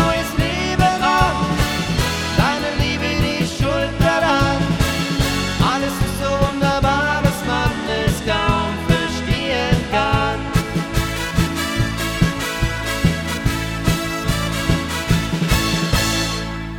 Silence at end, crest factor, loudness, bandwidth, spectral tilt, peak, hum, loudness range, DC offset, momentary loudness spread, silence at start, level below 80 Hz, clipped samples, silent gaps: 0 s; 18 dB; -19 LUFS; 19.5 kHz; -5 dB/octave; -2 dBFS; none; 2 LU; under 0.1%; 4 LU; 0 s; -28 dBFS; under 0.1%; none